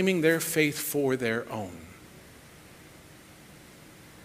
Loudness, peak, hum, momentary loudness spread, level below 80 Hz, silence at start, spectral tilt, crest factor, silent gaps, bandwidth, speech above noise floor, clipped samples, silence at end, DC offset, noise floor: -27 LUFS; -10 dBFS; none; 26 LU; -64 dBFS; 0 s; -4.5 dB/octave; 22 dB; none; 16 kHz; 24 dB; under 0.1%; 0 s; under 0.1%; -51 dBFS